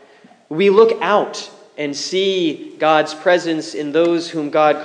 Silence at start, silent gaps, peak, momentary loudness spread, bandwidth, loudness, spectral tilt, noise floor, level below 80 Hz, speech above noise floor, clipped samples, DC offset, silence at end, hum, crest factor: 0.5 s; none; 0 dBFS; 12 LU; 10 kHz; -17 LUFS; -4.5 dB/octave; -47 dBFS; -80 dBFS; 31 dB; under 0.1%; under 0.1%; 0 s; none; 16 dB